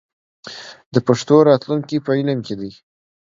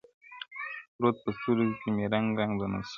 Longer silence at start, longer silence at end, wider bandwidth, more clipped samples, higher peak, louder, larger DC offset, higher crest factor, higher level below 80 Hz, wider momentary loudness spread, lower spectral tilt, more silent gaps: first, 0.45 s vs 0.3 s; first, 0.6 s vs 0 s; about the same, 7.6 kHz vs 7 kHz; neither; first, 0 dBFS vs -12 dBFS; first, -17 LUFS vs -30 LUFS; neither; about the same, 18 dB vs 18 dB; about the same, -60 dBFS vs -60 dBFS; first, 21 LU vs 13 LU; about the same, -6.5 dB/octave vs -7.5 dB/octave; second, 0.86-0.91 s vs 0.88-0.99 s